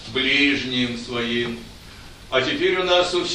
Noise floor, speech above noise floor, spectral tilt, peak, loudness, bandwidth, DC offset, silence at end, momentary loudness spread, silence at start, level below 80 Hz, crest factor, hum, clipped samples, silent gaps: -41 dBFS; 20 dB; -3.5 dB/octave; -4 dBFS; -20 LUFS; 12 kHz; under 0.1%; 0 s; 10 LU; 0 s; -46 dBFS; 18 dB; none; under 0.1%; none